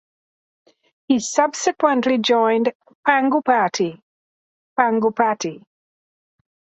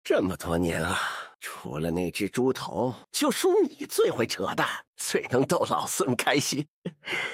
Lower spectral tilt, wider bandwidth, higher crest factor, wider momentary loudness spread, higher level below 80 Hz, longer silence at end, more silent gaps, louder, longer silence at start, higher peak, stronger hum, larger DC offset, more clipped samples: about the same, -3.5 dB/octave vs -4 dB/octave; second, 8.2 kHz vs 16.5 kHz; about the same, 20 dB vs 18 dB; about the same, 8 LU vs 8 LU; second, -70 dBFS vs -56 dBFS; first, 1.2 s vs 0 s; first, 2.75-2.80 s, 2.95-3.03 s, 4.02-4.76 s vs 4.87-4.93 s, 6.68-6.82 s; first, -19 LUFS vs -27 LUFS; first, 1.1 s vs 0.05 s; first, 0 dBFS vs -8 dBFS; neither; neither; neither